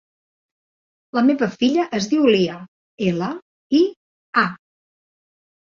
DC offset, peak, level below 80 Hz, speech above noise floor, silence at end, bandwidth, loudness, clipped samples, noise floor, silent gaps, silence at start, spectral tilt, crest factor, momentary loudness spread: under 0.1%; -2 dBFS; -62 dBFS; over 72 dB; 1.1 s; 7.4 kHz; -20 LUFS; under 0.1%; under -90 dBFS; 2.68-2.98 s, 3.42-3.70 s, 3.96-4.33 s; 1.15 s; -5.5 dB/octave; 18 dB; 9 LU